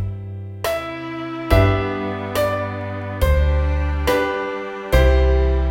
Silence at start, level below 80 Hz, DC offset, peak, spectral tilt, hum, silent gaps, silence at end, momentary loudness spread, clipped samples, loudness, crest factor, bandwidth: 0 s; -22 dBFS; under 0.1%; -2 dBFS; -6.5 dB/octave; none; none; 0 s; 12 LU; under 0.1%; -20 LUFS; 18 dB; 16.5 kHz